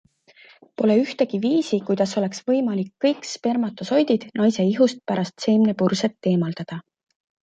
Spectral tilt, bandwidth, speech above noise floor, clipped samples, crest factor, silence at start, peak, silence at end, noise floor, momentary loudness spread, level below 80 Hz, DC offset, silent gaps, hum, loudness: -6 dB/octave; 8.8 kHz; 31 dB; under 0.1%; 16 dB; 0.8 s; -6 dBFS; 0.65 s; -52 dBFS; 7 LU; -68 dBFS; under 0.1%; none; none; -22 LUFS